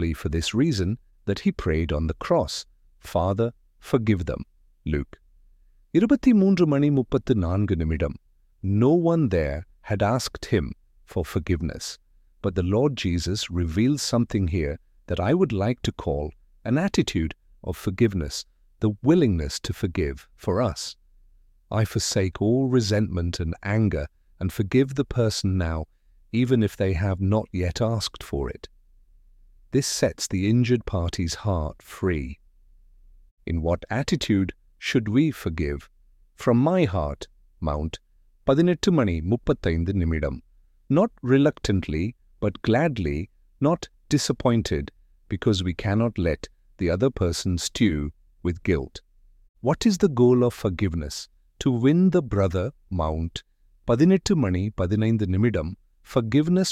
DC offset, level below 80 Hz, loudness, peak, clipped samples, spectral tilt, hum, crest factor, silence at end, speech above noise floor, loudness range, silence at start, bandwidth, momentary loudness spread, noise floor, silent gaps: under 0.1%; -40 dBFS; -24 LUFS; -6 dBFS; under 0.1%; -6 dB/octave; none; 18 dB; 0 s; 33 dB; 4 LU; 0 s; 15.5 kHz; 12 LU; -56 dBFS; 33.31-33.37 s, 49.49-49.54 s